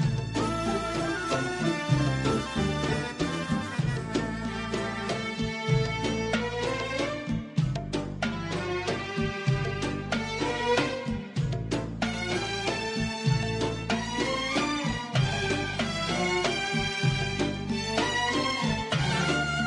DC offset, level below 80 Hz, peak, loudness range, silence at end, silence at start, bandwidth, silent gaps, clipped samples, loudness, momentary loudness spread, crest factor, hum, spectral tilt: under 0.1%; -46 dBFS; -12 dBFS; 3 LU; 0 s; 0 s; 11.5 kHz; none; under 0.1%; -29 LUFS; 5 LU; 16 dB; none; -5 dB/octave